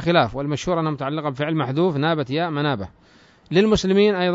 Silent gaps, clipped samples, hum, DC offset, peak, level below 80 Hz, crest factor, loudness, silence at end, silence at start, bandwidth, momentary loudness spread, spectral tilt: none; under 0.1%; none; under 0.1%; -4 dBFS; -46 dBFS; 18 dB; -21 LUFS; 0 s; 0 s; 7.8 kHz; 8 LU; -6 dB/octave